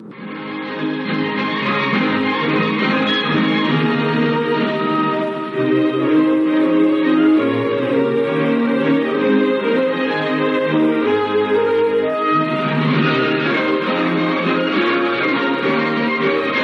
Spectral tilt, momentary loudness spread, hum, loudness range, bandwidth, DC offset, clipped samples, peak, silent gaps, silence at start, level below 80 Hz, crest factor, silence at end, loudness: -7.5 dB/octave; 4 LU; none; 1 LU; 6.2 kHz; under 0.1%; under 0.1%; -4 dBFS; none; 0 s; -70 dBFS; 12 dB; 0 s; -17 LUFS